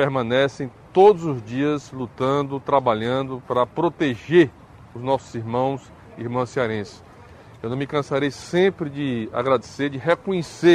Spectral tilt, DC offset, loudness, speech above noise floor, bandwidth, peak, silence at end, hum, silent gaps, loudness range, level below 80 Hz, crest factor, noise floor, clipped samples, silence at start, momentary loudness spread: -6.5 dB/octave; under 0.1%; -22 LUFS; 24 dB; 10.5 kHz; -4 dBFS; 0 s; none; none; 6 LU; -56 dBFS; 18 dB; -45 dBFS; under 0.1%; 0 s; 11 LU